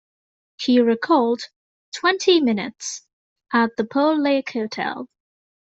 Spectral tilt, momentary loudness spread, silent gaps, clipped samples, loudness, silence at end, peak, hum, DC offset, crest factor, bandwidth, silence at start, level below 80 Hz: -3.5 dB/octave; 16 LU; 1.56-1.92 s, 3.13-3.36 s; under 0.1%; -20 LUFS; 0.7 s; -4 dBFS; none; under 0.1%; 18 dB; 8.2 kHz; 0.6 s; -68 dBFS